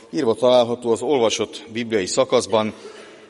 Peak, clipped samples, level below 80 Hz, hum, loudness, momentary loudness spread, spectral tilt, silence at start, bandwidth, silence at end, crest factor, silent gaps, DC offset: -2 dBFS; under 0.1%; -64 dBFS; none; -20 LUFS; 12 LU; -4 dB/octave; 0.1 s; 11.5 kHz; 0.15 s; 18 dB; none; under 0.1%